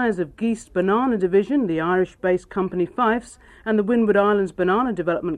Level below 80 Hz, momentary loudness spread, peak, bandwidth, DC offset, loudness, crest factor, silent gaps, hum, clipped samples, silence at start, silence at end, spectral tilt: -52 dBFS; 6 LU; -6 dBFS; 11 kHz; under 0.1%; -21 LUFS; 14 dB; none; none; under 0.1%; 0 s; 0 s; -7 dB/octave